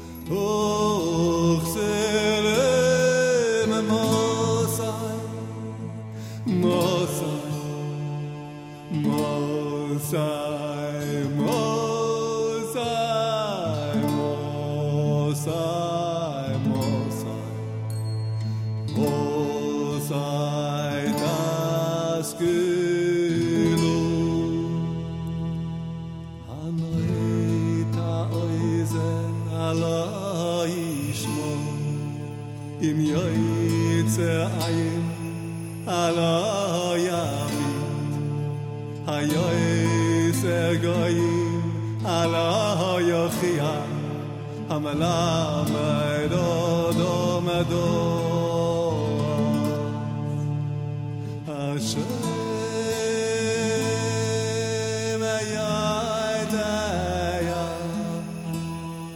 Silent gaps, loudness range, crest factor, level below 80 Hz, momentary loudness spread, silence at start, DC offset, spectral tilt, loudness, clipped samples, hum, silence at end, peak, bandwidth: none; 4 LU; 16 dB; -50 dBFS; 9 LU; 0 s; under 0.1%; -5.5 dB/octave; -25 LUFS; under 0.1%; none; 0 s; -8 dBFS; 17 kHz